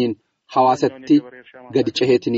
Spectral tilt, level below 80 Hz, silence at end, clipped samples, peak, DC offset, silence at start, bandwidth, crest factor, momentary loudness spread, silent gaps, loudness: -4.5 dB/octave; -62 dBFS; 0 s; under 0.1%; -4 dBFS; under 0.1%; 0 s; 8 kHz; 14 dB; 7 LU; none; -19 LUFS